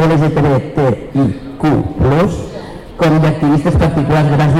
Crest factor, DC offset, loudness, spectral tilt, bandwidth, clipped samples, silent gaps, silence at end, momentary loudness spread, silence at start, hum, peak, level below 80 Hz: 6 dB; under 0.1%; -13 LUFS; -8 dB/octave; 11 kHz; under 0.1%; none; 0 s; 6 LU; 0 s; none; -6 dBFS; -28 dBFS